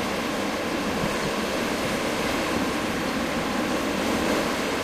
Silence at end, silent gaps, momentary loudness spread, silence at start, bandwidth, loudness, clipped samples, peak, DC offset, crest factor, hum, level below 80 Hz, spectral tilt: 0 s; none; 2 LU; 0 s; 15.5 kHz; -25 LUFS; under 0.1%; -12 dBFS; under 0.1%; 14 dB; none; -46 dBFS; -4 dB/octave